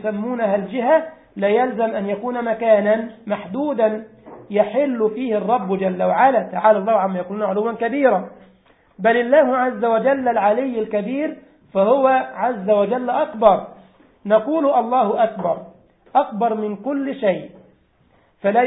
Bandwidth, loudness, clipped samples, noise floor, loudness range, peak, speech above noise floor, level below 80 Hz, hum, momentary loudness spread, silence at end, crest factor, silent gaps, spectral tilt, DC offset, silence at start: 4 kHz; -19 LUFS; under 0.1%; -58 dBFS; 2 LU; -2 dBFS; 39 dB; -64 dBFS; none; 9 LU; 0 s; 18 dB; none; -11.5 dB/octave; under 0.1%; 0 s